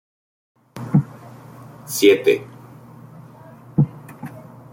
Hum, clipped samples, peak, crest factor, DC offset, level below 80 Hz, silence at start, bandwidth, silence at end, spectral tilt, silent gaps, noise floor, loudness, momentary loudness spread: none; under 0.1%; -2 dBFS; 20 dB; under 0.1%; -58 dBFS; 0.75 s; 16.5 kHz; 0.3 s; -6 dB/octave; none; -43 dBFS; -19 LUFS; 27 LU